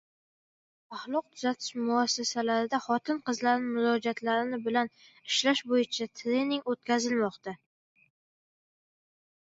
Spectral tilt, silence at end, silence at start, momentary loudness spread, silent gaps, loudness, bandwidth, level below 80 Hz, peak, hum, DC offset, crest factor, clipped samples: -3 dB/octave; 1.95 s; 0.9 s; 7 LU; none; -29 LUFS; 8 kHz; -80 dBFS; -12 dBFS; none; under 0.1%; 20 dB; under 0.1%